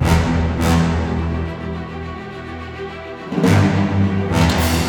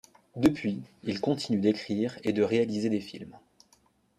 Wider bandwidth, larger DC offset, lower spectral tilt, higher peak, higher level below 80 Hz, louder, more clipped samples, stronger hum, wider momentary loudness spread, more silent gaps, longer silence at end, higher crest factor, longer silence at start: first, over 20 kHz vs 14.5 kHz; neither; about the same, -6 dB/octave vs -6.5 dB/octave; first, 0 dBFS vs -8 dBFS; first, -28 dBFS vs -62 dBFS; first, -18 LUFS vs -29 LUFS; neither; neither; about the same, 15 LU vs 16 LU; neither; second, 0 s vs 0.8 s; about the same, 16 dB vs 20 dB; second, 0 s vs 0.35 s